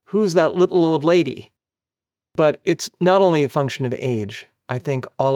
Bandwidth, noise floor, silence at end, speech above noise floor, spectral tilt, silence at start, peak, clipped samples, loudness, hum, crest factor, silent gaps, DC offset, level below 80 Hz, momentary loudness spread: 15.5 kHz; under -90 dBFS; 0 s; over 72 dB; -6.5 dB/octave; 0.15 s; -4 dBFS; under 0.1%; -19 LUFS; none; 16 dB; none; under 0.1%; -66 dBFS; 13 LU